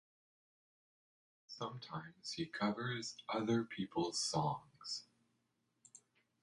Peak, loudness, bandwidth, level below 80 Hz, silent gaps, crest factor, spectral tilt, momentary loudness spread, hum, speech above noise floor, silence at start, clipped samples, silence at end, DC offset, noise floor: -24 dBFS; -41 LUFS; 11.5 kHz; -78 dBFS; none; 20 dB; -4 dB/octave; 10 LU; none; 42 dB; 1.5 s; under 0.1%; 0.45 s; under 0.1%; -83 dBFS